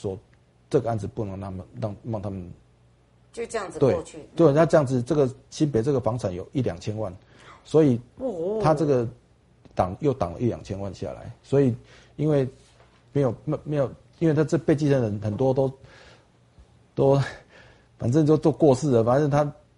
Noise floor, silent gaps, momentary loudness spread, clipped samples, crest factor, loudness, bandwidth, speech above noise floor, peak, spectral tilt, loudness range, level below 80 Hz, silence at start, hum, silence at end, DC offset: -58 dBFS; none; 14 LU; under 0.1%; 20 dB; -24 LUFS; 11 kHz; 35 dB; -4 dBFS; -8 dB/octave; 5 LU; -52 dBFS; 0.05 s; none; 0.25 s; under 0.1%